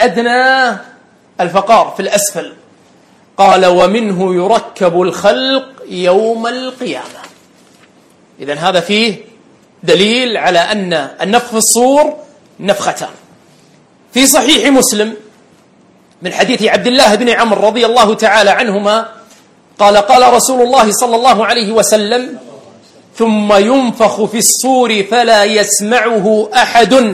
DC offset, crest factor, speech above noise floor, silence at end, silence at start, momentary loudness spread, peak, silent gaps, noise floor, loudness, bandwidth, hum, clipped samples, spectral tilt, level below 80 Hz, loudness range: under 0.1%; 12 dB; 36 dB; 0 s; 0 s; 13 LU; 0 dBFS; none; -46 dBFS; -10 LUFS; over 20 kHz; none; 0.7%; -3 dB/octave; -50 dBFS; 5 LU